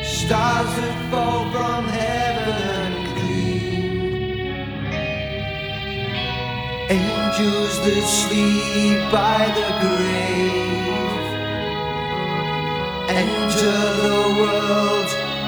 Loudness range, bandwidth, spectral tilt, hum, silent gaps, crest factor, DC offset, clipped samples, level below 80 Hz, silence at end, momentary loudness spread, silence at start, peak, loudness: 6 LU; over 20 kHz; -4.5 dB/octave; none; none; 16 dB; under 0.1%; under 0.1%; -40 dBFS; 0 s; 7 LU; 0 s; -4 dBFS; -20 LUFS